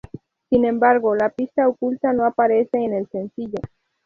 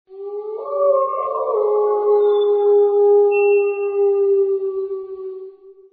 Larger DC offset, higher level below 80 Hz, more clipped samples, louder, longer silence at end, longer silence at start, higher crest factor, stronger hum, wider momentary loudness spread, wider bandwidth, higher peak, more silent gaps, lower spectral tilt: neither; first, -54 dBFS vs -76 dBFS; neither; second, -20 LUFS vs -17 LUFS; first, 0.4 s vs 0.2 s; about the same, 0.15 s vs 0.1 s; first, 18 dB vs 10 dB; neither; about the same, 13 LU vs 15 LU; first, 4.9 kHz vs 3.8 kHz; first, -2 dBFS vs -6 dBFS; neither; first, -9 dB/octave vs -2 dB/octave